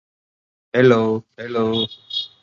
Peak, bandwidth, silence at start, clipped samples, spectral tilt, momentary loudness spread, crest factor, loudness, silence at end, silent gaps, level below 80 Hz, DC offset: 0 dBFS; 7.2 kHz; 0.75 s; under 0.1%; -6.5 dB/octave; 12 LU; 20 dB; -19 LUFS; 0.15 s; none; -60 dBFS; under 0.1%